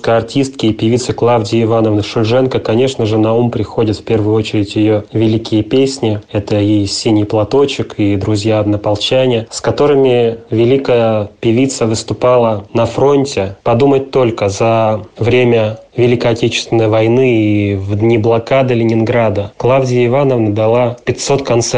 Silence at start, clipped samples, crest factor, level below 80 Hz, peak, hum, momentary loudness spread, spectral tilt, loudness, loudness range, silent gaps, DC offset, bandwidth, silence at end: 0.05 s; under 0.1%; 10 dB; -44 dBFS; -2 dBFS; none; 5 LU; -6 dB/octave; -12 LUFS; 1 LU; none; 0.4%; 9.8 kHz; 0 s